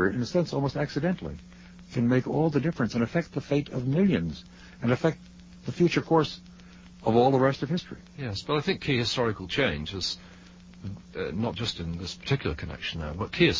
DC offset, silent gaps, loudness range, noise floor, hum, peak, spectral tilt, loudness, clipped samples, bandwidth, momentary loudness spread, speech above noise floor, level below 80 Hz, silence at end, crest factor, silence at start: under 0.1%; none; 5 LU; -49 dBFS; none; -8 dBFS; -6 dB/octave; -28 LUFS; under 0.1%; 7.6 kHz; 14 LU; 22 dB; -48 dBFS; 0 s; 20 dB; 0 s